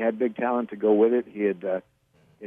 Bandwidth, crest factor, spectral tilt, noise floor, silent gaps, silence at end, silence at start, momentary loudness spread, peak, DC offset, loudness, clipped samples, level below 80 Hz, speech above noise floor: 3.7 kHz; 16 dB; -9.5 dB/octave; -60 dBFS; none; 0 s; 0 s; 10 LU; -8 dBFS; under 0.1%; -25 LUFS; under 0.1%; -76 dBFS; 37 dB